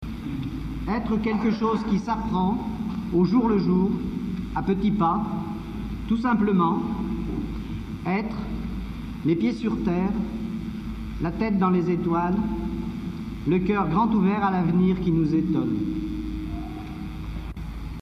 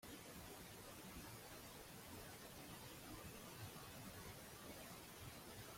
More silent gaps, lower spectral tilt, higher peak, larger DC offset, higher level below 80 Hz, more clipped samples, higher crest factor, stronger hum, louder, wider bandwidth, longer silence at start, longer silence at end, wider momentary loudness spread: neither; first, -9 dB/octave vs -3.5 dB/octave; first, -10 dBFS vs -42 dBFS; neither; first, -38 dBFS vs -70 dBFS; neither; about the same, 14 dB vs 14 dB; neither; first, -25 LUFS vs -56 LUFS; second, 6.4 kHz vs 16.5 kHz; about the same, 0 s vs 0 s; about the same, 0 s vs 0 s; first, 12 LU vs 1 LU